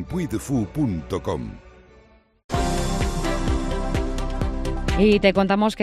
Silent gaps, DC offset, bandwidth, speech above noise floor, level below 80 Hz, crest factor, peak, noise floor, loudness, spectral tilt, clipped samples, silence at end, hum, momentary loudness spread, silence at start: 2.44-2.49 s; under 0.1%; 14 kHz; 32 dB; -30 dBFS; 18 dB; -4 dBFS; -53 dBFS; -23 LUFS; -6 dB/octave; under 0.1%; 0 s; none; 10 LU; 0 s